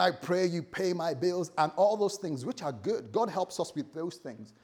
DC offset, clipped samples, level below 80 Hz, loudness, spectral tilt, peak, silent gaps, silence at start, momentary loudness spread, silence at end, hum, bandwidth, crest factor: under 0.1%; under 0.1%; -76 dBFS; -31 LUFS; -5 dB/octave; -10 dBFS; none; 0 s; 11 LU; 0.15 s; none; 17 kHz; 20 dB